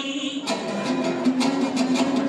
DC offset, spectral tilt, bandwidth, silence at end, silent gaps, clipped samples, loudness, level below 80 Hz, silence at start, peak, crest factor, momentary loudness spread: under 0.1%; -4 dB/octave; 11.5 kHz; 0 s; none; under 0.1%; -24 LUFS; -66 dBFS; 0 s; -8 dBFS; 14 dB; 5 LU